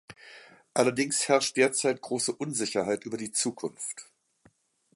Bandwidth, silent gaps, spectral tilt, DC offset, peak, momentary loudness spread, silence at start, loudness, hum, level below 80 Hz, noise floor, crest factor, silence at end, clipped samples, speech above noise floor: 11.5 kHz; none; -3 dB/octave; under 0.1%; -8 dBFS; 14 LU; 0.1 s; -28 LUFS; none; -74 dBFS; -65 dBFS; 22 dB; 0.9 s; under 0.1%; 37 dB